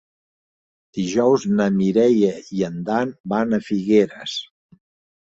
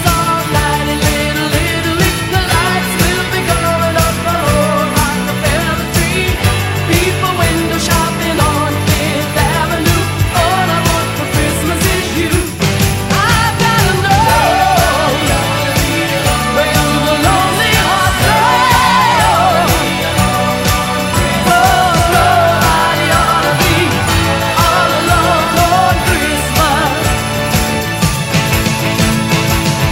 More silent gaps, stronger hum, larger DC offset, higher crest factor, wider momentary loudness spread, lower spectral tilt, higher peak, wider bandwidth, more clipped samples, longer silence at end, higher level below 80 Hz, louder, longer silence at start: first, 3.20-3.24 s vs none; neither; neither; about the same, 16 dB vs 12 dB; first, 11 LU vs 4 LU; first, -6.5 dB/octave vs -4 dB/octave; second, -4 dBFS vs 0 dBFS; second, 7.8 kHz vs 16.5 kHz; neither; first, 0.8 s vs 0 s; second, -60 dBFS vs -24 dBFS; second, -20 LUFS vs -12 LUFS; first, 0.95 s vs 0 s